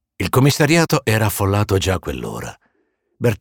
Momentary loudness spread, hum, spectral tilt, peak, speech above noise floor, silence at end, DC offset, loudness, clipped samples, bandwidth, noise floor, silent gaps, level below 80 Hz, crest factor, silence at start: 13 LU; none; -5 dB/octave; -4 dBFS; 50 dB; 0.05 s; under 0.1%; -17 LUFS; under 0.1%; 18.5 kHz; -67 dBFS; none; -40 dBFS; 14 dB; 0.2 s